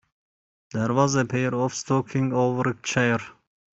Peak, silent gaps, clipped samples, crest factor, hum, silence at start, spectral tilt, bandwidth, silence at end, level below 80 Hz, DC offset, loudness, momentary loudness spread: -6 dBFS; none; under 0.1%; 20 dB; none; 0.75 s; -5.5 dB/octave; 8 kHz; 0.4 s; -60 dBFS; under 0.1%; -24 LUFS; 7 LU